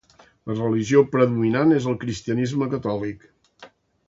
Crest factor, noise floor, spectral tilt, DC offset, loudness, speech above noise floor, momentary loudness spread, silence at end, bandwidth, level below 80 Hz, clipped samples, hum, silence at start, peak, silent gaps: 20 dB; -50 dBFS; -7 dB/octave; under 0.1%; -22 LUFS; 29 dB; 12 LU; 0.45 s; 7.8 kHz; -56 dBFS; under 0.1%; none; 0.45 s; -2 dBFS; none